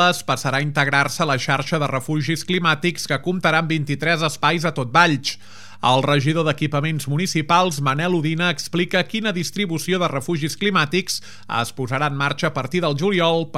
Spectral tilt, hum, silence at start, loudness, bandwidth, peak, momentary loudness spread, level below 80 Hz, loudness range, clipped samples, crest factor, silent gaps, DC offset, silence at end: -4.5 dB/octave; none; 0 s; -20 LUFS; 15.5 kHz; 0 dBFS; 6 LU; -64 dBFS; 3 LU; under 0.1%; 20 dB; none; 1%; 0 s